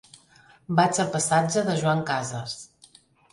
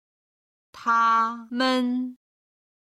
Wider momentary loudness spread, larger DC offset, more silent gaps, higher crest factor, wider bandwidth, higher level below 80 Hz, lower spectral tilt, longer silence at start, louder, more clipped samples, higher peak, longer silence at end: about the same, 12 LU vs 11 LU; neither; neither; about the same, 20 dB vs 16 dB; about the same, 11.5 kHz vs 11.5 kHz; first, -64 dBFS vs -76 dBFS; first, -4.5 dB/octave vs -3 dB/octave; about the same, 0.7 s vs 0.75 s; about the same, -24 LUFS vs -23 LUFS; neither; first, -6 dBFS vs -10 dBFS; about the same, 0.7 s vs 0.8 s